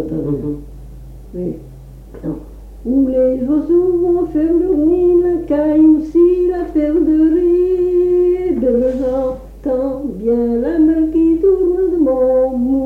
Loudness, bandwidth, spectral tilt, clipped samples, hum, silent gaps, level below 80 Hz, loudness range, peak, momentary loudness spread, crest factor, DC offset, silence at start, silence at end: -14 LUFS; 3.2 kHz; -10 dB/octave; under 0.1%; none; none; -34 dBFS; 5 LU; -2 dBFS; 13 LU; 12 dB; under 0.1%; 0 s; 0 s